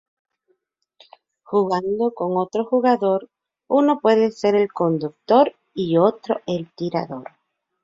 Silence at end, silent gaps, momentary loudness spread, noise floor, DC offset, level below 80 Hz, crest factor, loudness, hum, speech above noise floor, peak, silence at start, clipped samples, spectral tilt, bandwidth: 0.6 s; none; 9 LU; -69 dBFS; under 0.1%; -66 dBFS; 18 dB; -20 LUFS; none; 50 dB; -2 dBFS; 1.5 s; under 0.1%; -7.5 dB/octave; 7.8 kHz